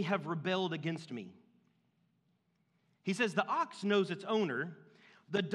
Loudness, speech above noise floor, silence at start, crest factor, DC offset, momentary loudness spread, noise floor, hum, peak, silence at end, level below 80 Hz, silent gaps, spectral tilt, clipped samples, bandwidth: -35 LUFS; 42 dB; 0 s; 22 dB; under 0.1%; 12 LU; -77 dBFS; none; -14 dBFS; 0 s; under -90 dBFS; none; -5.5 dB/octave; under 0.1%; 11.5 kHz